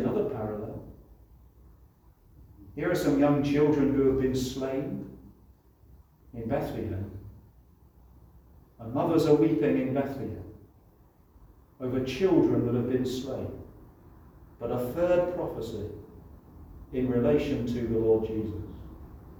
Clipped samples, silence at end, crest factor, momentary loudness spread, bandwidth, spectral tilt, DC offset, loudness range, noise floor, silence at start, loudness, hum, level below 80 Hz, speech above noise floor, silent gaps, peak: under 0.1%; 0 s; 20 dB; 21 LU; over 20 kHz; -7.5 dB/octave; under 0.1%; 9 LU; -59 dBFS; 0 s; -28 LUFS; none; -50 dBFS; 32 dB; none; -10 dBFS